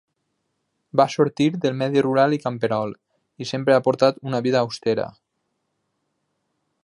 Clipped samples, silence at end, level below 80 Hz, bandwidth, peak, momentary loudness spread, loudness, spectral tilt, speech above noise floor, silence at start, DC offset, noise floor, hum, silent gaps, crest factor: under 0.1%; 1.75 s; -66 dBFS; 11 kHz; -2 dBFS; 8 LU; -21 LUFS; -6.5 dB/octave; 55 dB; 0.95 s; under 0.1%; -75 dBFS; none; none; 20 dB